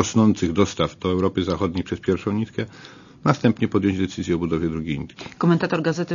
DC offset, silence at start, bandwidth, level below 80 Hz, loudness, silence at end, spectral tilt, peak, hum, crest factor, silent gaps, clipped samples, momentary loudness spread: under 0.1%; 0 s; 7.4 kHz; -48 dBFS; -22 LUFS; 0 s; -6.5 dB/octave; 0 dBFS; none; 20 dB; none; under 0.1%; 10 LU